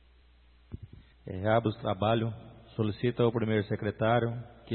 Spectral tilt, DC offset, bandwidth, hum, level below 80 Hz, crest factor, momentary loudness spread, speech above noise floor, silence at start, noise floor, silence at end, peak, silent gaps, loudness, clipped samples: -11 dB/octave; under 0.1%; 4.4 kHz; 60 Hz at -55 dBFS; -58 dBFS; 20 dB; 20 LU; 31 dB; 0.7 s; -60 dBFS; 0 s; -12 dBFS; none; -30 LUFS; under 0.1%